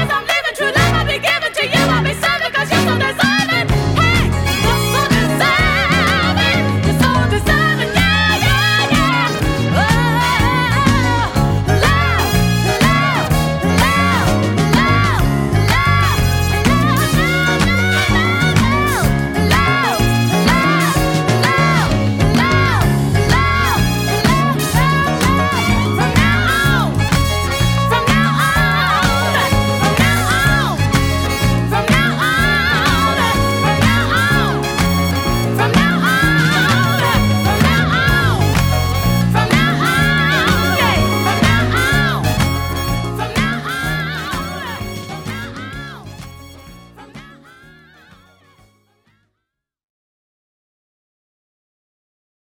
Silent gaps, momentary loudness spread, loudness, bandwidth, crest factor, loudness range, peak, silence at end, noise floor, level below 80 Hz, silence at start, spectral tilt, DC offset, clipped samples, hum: none; 4 LU; -14 LUFS; 18 kHz; 14 dB; 2 LU; 0 dBFS; 5.25 s; -77 dBFS; -26 dBFS; 0 s; -5 dB/octave; under 0.1%; under 0.1%; none